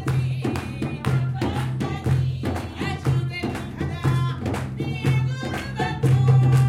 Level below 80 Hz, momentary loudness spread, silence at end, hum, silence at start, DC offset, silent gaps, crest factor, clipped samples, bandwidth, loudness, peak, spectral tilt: -44 dBFS; 9 LU; 0 s; none; 0 s; under 0.1%; none; 16 dB; under 0.1%; 12 kHz; -24 LUFS; -6 dBFS; -7 dB/octave